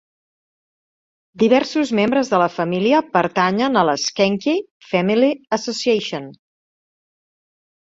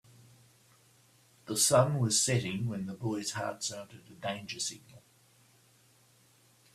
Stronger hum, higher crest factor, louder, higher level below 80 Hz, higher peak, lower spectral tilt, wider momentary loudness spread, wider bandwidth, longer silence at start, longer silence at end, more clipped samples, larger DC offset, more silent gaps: neither; about the same, 18 dB vs 22 dB; first, -18 LUFS vs -31 LUFS; first, -62 dBFS vs -68 dBFS; first, -2 dBFS vs -12 dBFS; first, -5 dB/octave vs -3.5 dB/octave; second, 7 LU vs 15 LU; second, 7.8 kHz vs 15.5 kHz; about the same, 1.35 s vs 1.45 s; second, 1.5 s vs 1.75 s; neither; neither; first, 4.71-4.80 s vs none